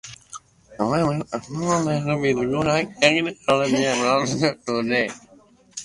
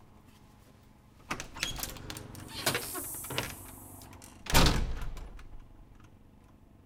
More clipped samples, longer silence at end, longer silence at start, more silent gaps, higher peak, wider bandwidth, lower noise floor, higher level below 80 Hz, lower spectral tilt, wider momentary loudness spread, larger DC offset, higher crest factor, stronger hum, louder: neither; second, 0 s vs 0.7 s; about the same, 0.05 s vs 0 s; neither; first, -2 dBFS vs -6 dBFS; second, 11.5 kHz vs 18 kHz; second, -44 dBFS vs -58 dBFS; second, -54 dBFS vs -40 dBFS; first, -4.5 dB/octave vs -3 dB/octave; second, 18 LU vs 22 LU; neither; second, 20 dB vs 28 dB; neither; first, -21 LUFS vs -33 LUFS